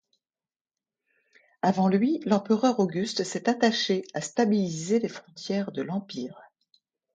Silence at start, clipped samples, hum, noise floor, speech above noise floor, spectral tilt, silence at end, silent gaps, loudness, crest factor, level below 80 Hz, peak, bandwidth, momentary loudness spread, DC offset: 1.65 s; under 0.1%; none; under -90 dBFS; over 64 dB; -5.5 dB/octave; 0.75 s; none; -26 LUFS; 18 dB; -74 dBFS; -8 dBFS; 9.2 kHz; 10 LU; under 0.1%